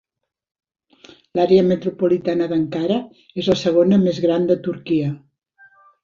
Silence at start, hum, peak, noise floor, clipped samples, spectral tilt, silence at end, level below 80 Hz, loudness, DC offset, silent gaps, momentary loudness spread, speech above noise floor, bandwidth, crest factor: 1.35 s; none; -2 dBFS; -51 dBFS; under 0.1%; -7.5 dB/octave; 0.85 s; -56 dBFS; -19 LUFS; under 0.1%; none; 10 LU; 34 dB; 7.4 kHz; 16 dB